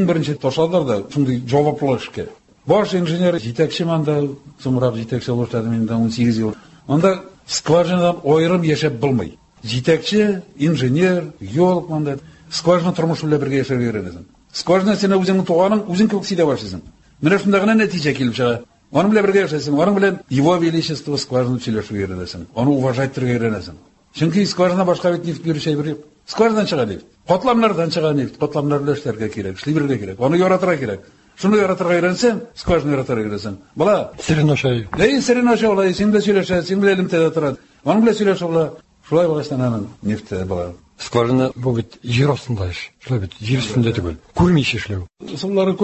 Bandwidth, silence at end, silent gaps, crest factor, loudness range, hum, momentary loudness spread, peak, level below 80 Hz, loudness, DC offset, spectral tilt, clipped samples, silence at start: 8.4 kHz; 0 s; none; 16 dB; 4 LU; none; 10 LU; -2 dBFS; -44 dBFS; -18 LUFS; under 0.1%; -6.5 dB/octave; under 0.1%; 0 s